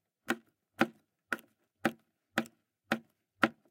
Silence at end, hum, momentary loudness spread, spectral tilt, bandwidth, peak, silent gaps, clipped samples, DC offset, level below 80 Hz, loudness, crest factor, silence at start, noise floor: 0.2 s; none; 8 LU; -4 dB/octave; 17 kHz; -6 dBFS; none; under 0.1%; under 0.1%; -86 dBFS; -37 LUFS; 32 dB; 0.3 s; -59 dBFS